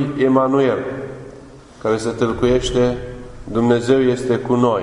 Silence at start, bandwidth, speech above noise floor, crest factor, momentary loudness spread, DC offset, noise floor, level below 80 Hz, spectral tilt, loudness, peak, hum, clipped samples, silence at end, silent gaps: 0 s; 11 kHz; 23 dB; 16 dB; 17 LU; under 0.1%; -40 dBFS; -38 dBFS; -6.5 dB/octave; -18 LUFS; -2 dBFS; none; under 0.1%; 0 s; none